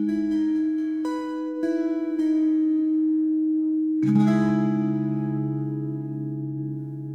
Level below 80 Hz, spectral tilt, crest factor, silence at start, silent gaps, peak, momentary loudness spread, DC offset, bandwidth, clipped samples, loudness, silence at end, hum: -64 dBFS; -9 dB/octave; 14 dB; 0 s; none; -10 dBFS; 10 LU; under 0.1%; 6.6 kHz; under 0.1%; -24 LUFS; 0 s; none